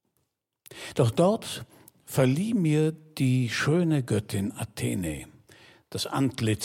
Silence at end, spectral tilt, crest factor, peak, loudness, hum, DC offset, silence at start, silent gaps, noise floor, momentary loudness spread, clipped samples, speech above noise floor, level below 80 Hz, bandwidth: 0 s; -6 dB/octave; 18 dB; -10 dBFS; -27 LUFS; none; under 0.1%; 0.7 s; none; -77 dBFS; 11 LU; under 0.1%; 51 dB; -56 dBFS; 16.5 kHz